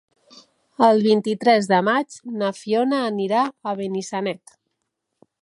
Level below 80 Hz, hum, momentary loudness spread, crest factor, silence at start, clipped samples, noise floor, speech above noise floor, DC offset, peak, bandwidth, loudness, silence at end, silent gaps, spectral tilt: -74 dBFS; none; 10 LU; 18 dB; 0.8 s; under 0.1%; -78 dBFS; 58 dB; under 0.1%; -4 dBFS; 11.5 kHz; -21 LUFS; 1.05 s; none; -5.5 dB/octave